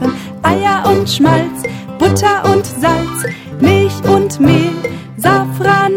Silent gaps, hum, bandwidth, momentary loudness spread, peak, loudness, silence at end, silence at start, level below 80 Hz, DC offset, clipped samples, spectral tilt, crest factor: none; none; 17.5 kHz; 9 LU; 0 dBFS; -13 LUFS; 0 s; 0 s; -40 dBFS; under 0.1%; under 0.1%; -5.5 dB/octave; 12 dB